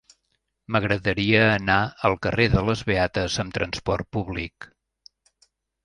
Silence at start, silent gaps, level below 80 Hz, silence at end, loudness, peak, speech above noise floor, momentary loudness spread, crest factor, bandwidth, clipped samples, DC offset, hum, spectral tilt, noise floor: 0.7 s; none; -42 dBFS; 1.2 s; -23 LUFS; -2 dBFS; 52 dB; 10 LU; 22 dB; 11 kHz; under 0.1%; under 0.1%; none; -5.5 dB/octave; -75 dBFS